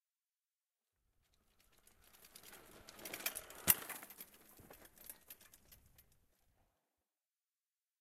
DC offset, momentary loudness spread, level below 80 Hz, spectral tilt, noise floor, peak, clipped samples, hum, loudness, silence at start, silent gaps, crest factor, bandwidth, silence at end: under 0.1%; 27 LU; -76 dBFS; -1 dB/octave; under -90 dBFS; -10 dBFS; under 0.1%; none; -38 LUFS; 2.15 s; none; 40 dB; 16 kHz; 2 s